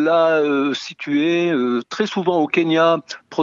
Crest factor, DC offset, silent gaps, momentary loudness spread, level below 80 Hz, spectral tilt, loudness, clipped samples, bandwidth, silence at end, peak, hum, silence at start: 14 dB; under 0.1%; none; 7 LU; -72 dBFS; -5.5 dB/octave; -18 LUFS; under 0.1%; 7.6 kHz; 0 s; -4 dBFS; none; 0 s